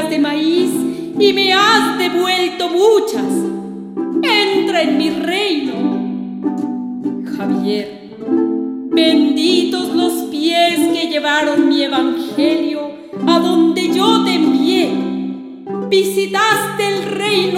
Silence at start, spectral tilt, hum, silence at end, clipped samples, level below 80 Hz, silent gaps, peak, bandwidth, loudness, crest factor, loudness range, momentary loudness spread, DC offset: 0 s; -4 dB/octave; none; 0 s; under 0.1%; -62 dBFS; none; 0 dBFS; 16 kHz; -15 LUFS; 16 dB; 4 LU; 10 LU; under 0.1%